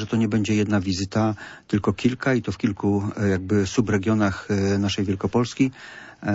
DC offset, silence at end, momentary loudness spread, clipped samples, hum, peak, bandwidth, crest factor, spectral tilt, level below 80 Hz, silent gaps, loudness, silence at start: under 0.1%; 0 s; 4 LU; under 0.1%; none; -6 dBFS; 8 kHz; 16 dB; -6 dB/octave; -52 dBFS; none; -23 LUFS; 0 s